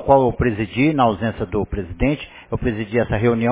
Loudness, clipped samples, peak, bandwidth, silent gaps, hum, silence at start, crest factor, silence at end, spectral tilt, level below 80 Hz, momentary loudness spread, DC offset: -20 LUFS; under 0.1%; 0 dBFS; 4 kHz; none; none; 0 s; 18 dB; 0 s; -11.5 dB/octave; -34 dBFS; 8 LU; under 0.1%